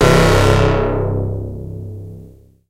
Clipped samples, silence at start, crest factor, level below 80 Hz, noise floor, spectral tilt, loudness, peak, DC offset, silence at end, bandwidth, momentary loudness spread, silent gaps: under 0.1%; 0 s; 16 dB; -26 dBFS; -41 dBFS; -6 dB/octave; -15 LUFS; 0 dBFS; under 0.1%; 0.4 s; 16 kHz; 20 LU; none